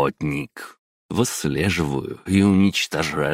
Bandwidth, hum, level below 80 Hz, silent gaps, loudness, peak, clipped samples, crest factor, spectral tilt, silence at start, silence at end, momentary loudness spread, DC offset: 16 kHz; none; -46 dBFS; 0.79-1.09 s; -21 LUFS; -4 dBFS; under 0.1%; 16 dB; -5 dB/octave; 0 s; 0 s; 13 LU; under 0.1%